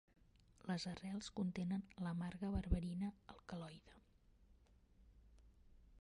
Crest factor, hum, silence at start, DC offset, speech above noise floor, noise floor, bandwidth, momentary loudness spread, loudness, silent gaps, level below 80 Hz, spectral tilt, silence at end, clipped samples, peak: 24 dB; none; 0.65 s; under 0.1%; 26 dB; -71 dBFS; 11.5 kHz; 13 LU; -46 LUFS; none; -54 dBFS; -6.5 dB/octave; 0 s; under 0.1%; -24 dBFS